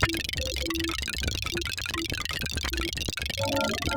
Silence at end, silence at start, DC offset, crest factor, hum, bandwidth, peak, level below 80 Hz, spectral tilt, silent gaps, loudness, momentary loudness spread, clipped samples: 0 s; 0 s; under 0.1%; 22 dB; none; over 20 kHz; -8 dBFS; -38 dBFS; -3 dB/octave; none; -29 LUFS; 3 LU; under 0.1%